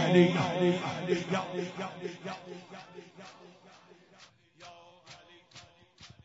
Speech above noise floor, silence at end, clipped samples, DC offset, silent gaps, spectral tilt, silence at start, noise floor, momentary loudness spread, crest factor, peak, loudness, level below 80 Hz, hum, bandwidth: 29 dB; 0.2 s; under 0.1%; under 0.1%; none; -6.5 dB/octave; 0 s; -59 dBFS; 26 LU; 24 dB; -10 dBFS; -31 LUFS; -74 dBFS; none; 7.8 kHz